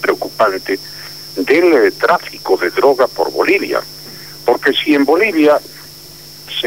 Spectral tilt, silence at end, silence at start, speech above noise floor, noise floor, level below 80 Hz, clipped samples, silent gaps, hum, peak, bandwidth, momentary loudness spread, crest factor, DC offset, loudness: -4 dB/octave; 0 s; 0 s; 22 dB; -35 dBFS; -56 dBFS; under 0.1%; none; none; 0 dBFS; 16.5 kHz; 19 LU; 14 dB; 0.4%; -14 LUFS